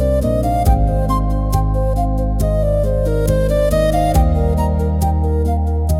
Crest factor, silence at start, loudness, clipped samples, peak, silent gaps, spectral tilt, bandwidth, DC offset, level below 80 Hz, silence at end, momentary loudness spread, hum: 12 dB; 0 s; -17 LUFS; under 0.1%; -2 dBFS; none; -7.5 dB/octave; 16 kHz; under 0.1%; -18 dBFS; 0 s; 3 LU; none